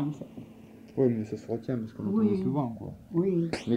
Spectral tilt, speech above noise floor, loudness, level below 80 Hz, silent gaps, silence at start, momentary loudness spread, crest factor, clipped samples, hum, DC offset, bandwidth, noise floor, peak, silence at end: -8.5 dB/octave; 21 dB; -30 LUFS; -62 dBFS; none; 0 s; 17 LU; 16 dB; under 0.1%; none; under 0.1%; 10.5 kHz; -50 dBFS; -14 dBFS; 0 s